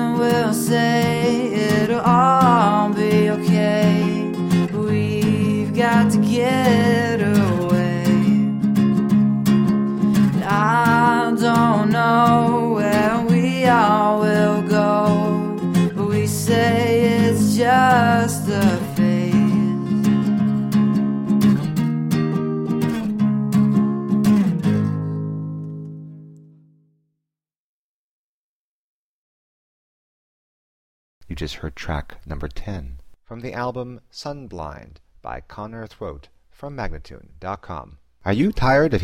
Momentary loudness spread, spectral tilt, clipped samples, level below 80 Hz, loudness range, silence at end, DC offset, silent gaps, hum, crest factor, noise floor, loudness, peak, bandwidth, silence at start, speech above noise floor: 17 LU; -6.5 dB/octave; under 0.1%; -42 dBFS; 17 LU; 0 s; under 0.1%; 27.58-31.21 s; none; 14 dB; -85 dBFS; -18 LUFS; -4 dBFS; 16.5 kHz; 0 s; 62 dB